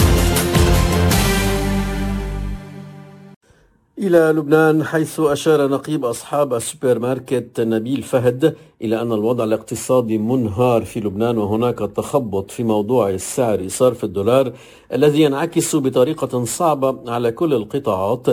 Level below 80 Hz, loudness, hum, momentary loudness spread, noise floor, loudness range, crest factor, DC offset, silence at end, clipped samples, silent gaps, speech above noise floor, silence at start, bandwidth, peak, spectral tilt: -30 dBFS; -18 LUFS; none; 8 LU; -55 dBFS; 2 LU; 16 dB; under 0.1%; 0 s; under 0.1%; 3.36-3.41 s; 37 dB; 0 s; 16 kHz; -2 dBFS; -5.5 dB/octave